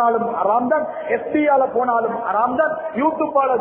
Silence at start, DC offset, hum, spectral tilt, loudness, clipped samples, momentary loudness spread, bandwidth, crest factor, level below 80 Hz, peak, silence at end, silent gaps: 0 s; under 0.1%; none; -10 dB/octave; -19 LUFS; under 0.1%; 4 LU; 3.6 kHz; 14 dB; -60 dBFS; -4 dBFS; 0 s; none